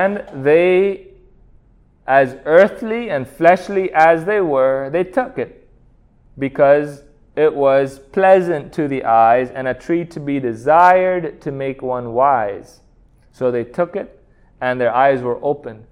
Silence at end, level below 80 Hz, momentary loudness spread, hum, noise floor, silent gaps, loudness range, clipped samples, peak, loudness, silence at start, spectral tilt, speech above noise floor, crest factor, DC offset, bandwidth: 0.15 s; -50 dBFS; 12 LU; none; -51 dBFS; none; 5 LU; under 0.1%; 0 dBFS; -16 LUFS; 0 s; -7 dB/octave; 36 dB; 16 dB; under 0.1%; 11 kHz